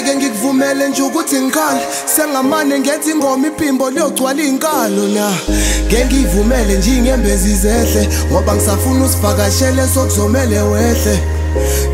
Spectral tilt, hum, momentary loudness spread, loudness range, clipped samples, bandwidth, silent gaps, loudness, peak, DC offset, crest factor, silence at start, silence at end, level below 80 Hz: -4.5 dB/octave; none; 3 LU; 1 LU; under 0.1%; 16.5 kHz; none; -13 LUFS; 0 dBFS; under 0.1%; 12 dB; 0 s; 0 s; -20 dBFS